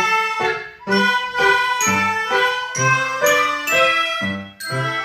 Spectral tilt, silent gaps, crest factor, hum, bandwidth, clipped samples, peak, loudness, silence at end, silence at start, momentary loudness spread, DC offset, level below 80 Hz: -2.5 dB/octave; none; 16 dB; none; 16 kHz; under 0.1%; -2 dBFS; -17 LUFS; 0 s; 0 s; 8 LU; under 0.1%; -56 dBFS